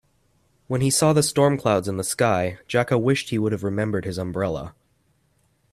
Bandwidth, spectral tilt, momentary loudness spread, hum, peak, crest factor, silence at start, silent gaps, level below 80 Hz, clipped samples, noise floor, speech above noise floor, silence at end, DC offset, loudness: 15.5 kHz; -5 dB/octave; 9 LU; none; -4 dBFS; 18 dB; 0.7 s; none; -54 dBFS; under 0.1%; -65 dBFS; 44 dB; 1 s; under 0.1%; -22 LUFS